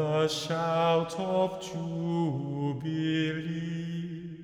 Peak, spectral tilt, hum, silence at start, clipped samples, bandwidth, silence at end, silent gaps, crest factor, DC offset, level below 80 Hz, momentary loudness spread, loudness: -16 dBFS; -6 dB/octave; none; 0 s; under 0.1%; 14 kHz; 0 s; none; 14 dB; under 0.1%; -64 dBFS; 8 LU; -30 LUFS